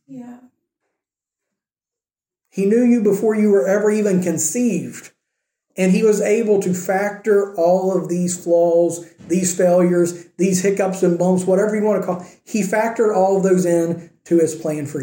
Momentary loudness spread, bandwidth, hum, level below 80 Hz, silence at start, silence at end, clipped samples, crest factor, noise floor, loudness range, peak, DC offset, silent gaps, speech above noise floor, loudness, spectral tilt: 9 LU; 17 kHz; none; -68 dBFS; 0.1 s; 0 s; under 0.1%; 14 dB; under -90 dBFS; 2 LU; -4 dBFS; under 0.1%; none; over 73 dB; -17 LUFS; -6 dB/octave